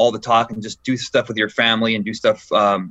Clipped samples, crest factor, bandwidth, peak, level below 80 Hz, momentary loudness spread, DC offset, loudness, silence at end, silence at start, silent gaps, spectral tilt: under 0.1%; 16 dB; 8.4 kHz; -2 dBFS; -58 dBFS; 8 LU; under 0.1%; -18 LUFS; 0 s; 0 s; none; -4.5 dB/octave